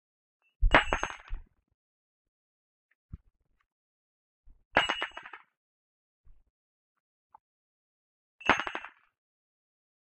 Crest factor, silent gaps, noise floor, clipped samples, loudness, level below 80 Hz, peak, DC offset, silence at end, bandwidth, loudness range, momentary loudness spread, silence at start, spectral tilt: 32 dB; 1.74-2.89 s, 2.95-3.09 s, 3.72-4.44 s, 4.65-4.71 s, 5.57-6.24 s, 6.50-7.30 s, 7.40-8.39 s; -49 dBFS; under 0.1%; -29 LUFS; -42 dBFS; -4 dBFS; under 0.1%; 1.15 s; 8.2 kHz; 10 LU; 24 LU; 0.6 s; -4 dB/octave